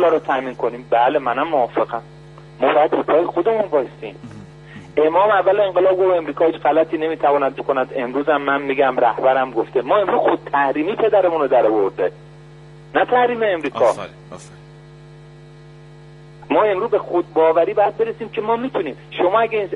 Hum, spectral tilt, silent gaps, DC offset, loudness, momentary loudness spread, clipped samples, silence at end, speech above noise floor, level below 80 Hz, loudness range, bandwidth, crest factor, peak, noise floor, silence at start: none; -6.5 dB/octave; none; under 0.1%; -18 LUFS; 9 LU; under 0.1%; 0 s; 24 dB; -56 dBFS; 4 LU; 10.5 kHz; 16 dB; -2 dBFS; -41 dBFS; 0 s